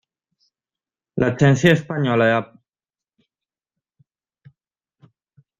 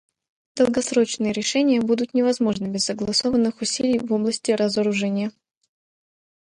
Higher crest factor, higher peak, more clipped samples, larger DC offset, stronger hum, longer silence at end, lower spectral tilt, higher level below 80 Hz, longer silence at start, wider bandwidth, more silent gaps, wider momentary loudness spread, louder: first, 22 dB vs 16 dB; first, -2 dBFS vs -6 dBFS; neither; neither; neither; first, 3.15 s vs 1.2 s; first, -6.5 dB/octave vs -4 dB/octave; about the same, -54 dBFS vs -58 dBFS; first, 1.15 s vs 0.55 s; second, 7.8 kHz vs 11 kHz; neither; first, 12 LU vs 4 LU; first, -18 LUFS vs -22 LUFS